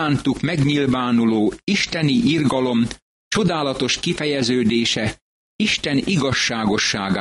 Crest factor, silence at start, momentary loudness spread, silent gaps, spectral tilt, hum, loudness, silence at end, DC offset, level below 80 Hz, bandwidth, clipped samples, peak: 12 dB; 0 s; 4 LU; 3.02-3.31 s, 5.21-5.59 s; -4.5 dB/octave; none; -19 LUFS; 0 s; under 0.1%; -46 dBFS; 11.5 kHz; under 0.1%; -6 dBFS